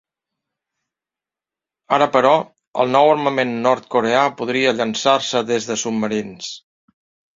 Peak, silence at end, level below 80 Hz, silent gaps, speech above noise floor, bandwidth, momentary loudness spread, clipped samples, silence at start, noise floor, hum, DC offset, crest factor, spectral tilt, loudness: -2 dBFS; 0.8 s; -64 dBFS; 2.67-2.74 s; 71 dB; 7.8 kHz; 11 LU; under 0.1%; 1.9 s; -89 dBFS; none; under 0.1%; 18 dB; -4 dB/octave; -18 LUFS